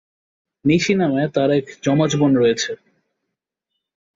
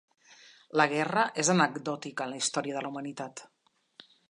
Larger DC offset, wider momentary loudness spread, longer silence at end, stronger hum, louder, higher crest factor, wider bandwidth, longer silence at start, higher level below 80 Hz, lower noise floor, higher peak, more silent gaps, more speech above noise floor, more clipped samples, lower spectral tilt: neither; second, 8 LU vs 14 LU; first, 1.4 s vs 0.85 s; neither; first, -18 LUFS vs -29 LUFS; second, 16 dB vs 22 dB; second, 7.8 kHz vs 11.5 kHz; first, 0.65 s vs 0.3 s; first, -56 dBFS vs -80 dBFS; first, -80 dBFS vs -58 dBFS; first, -4 dBFS vs -10 dBFS; neither; first, 63 dB vs 29 dB; neither; first, -5.5 dB/octave vs -3.5 dB/octave